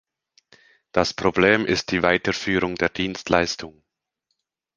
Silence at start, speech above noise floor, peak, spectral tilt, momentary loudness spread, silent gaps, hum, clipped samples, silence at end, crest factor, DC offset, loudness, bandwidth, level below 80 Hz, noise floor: 0.95 s; 56 dB; 0 dBFS; -4.5 dB/octave; 9 LU; none; none; under 0.1%; 1.05 s; 24 dB; under 0.1%; -21 LUFS; 9.8 kHz; -48 dBFS; -77 dBFS